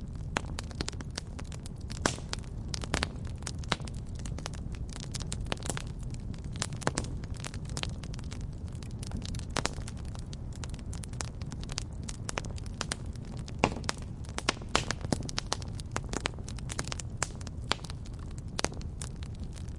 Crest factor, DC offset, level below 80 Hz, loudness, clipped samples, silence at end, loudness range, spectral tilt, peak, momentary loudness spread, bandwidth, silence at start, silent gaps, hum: 32 dB; under 0.1%; -42 dBFS; -37 LUFS; under 0.1%; 0 s; 4 LU; -4 dB/octave; -4 dBFS; 8 LU; 11.5 kHz; 0 s; none; none